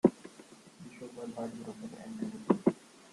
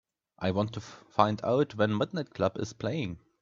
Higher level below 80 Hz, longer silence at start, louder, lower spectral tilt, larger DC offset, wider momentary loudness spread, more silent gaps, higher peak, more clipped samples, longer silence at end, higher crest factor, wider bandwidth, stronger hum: second, -72 dBFS vs -64 dBFS; second, 0.05 s vs 0.4 s; second, -35 LUFS vs -30 LUFS; about the same, -7.5 dB/octave vs -6.5 dB/octave; neither; first, 22 LU vs 8 LU; neither; about the same, -8 dBFS vs -6 dBFS; neither; second, 0.05 s vs 0.25 s; about the same, 26 dB vs 24 dB; first, 12 kHz vs 7.6 kHz; neither